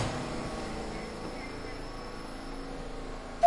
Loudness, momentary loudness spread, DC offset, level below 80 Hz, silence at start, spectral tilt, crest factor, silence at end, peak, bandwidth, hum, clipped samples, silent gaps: -39 LUFS; 6 LU; under 0.1%; -44 dBFS; 0 s; -5 dB/octave; 24 dB; 0 s; -10 dBFS; 11.5 kHz; none; under 0.1%; none